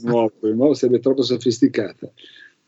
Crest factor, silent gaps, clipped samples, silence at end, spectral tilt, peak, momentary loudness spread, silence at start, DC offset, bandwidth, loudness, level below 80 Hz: 16 dB; none; under 0.1%; 0.6 s; -6 dB/octave; -2 dBFS; 13 LU; 0 s; under 0.1%; 8 kHz; -19 LUFS; -74 dBFS